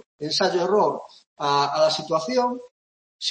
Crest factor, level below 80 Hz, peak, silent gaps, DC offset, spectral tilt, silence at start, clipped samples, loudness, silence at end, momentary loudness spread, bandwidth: 16 dB; -72 dBFS; -8 dBFS; 1.26-1.36 s, 2.71-3.19 s; under 0.1%; -3.5 dB/octave; 0.2 s; under 0.1%; -22 LUFS; 0 s; 8 LU; 8.8 kHz